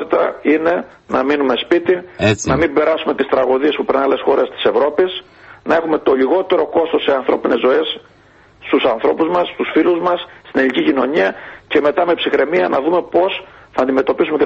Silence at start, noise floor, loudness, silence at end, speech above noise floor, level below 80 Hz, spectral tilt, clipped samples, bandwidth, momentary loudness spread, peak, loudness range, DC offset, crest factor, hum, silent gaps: 0 s; -47 dBFS; -16 LUFS; 0 s; 32 dB; -46 dBFS; -5 dB/octave; under 0.1%; 8.4 kHz; 5 LU; -2 dBFS; 1 LU; under 0.1%; 14 dB; none; none